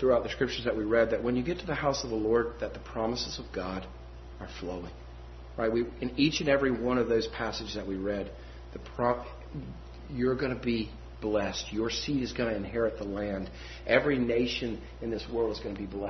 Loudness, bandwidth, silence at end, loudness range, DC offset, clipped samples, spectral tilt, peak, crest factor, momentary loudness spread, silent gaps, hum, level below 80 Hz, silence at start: -31 LUFS; 6.4 kHz; 0 s; 4 LU; under 0.1%; under 0.1%; -5.5 dB/octave; -8 dBFS; 24 dB; 16 LU; none; none; -46 dBFS; 0 s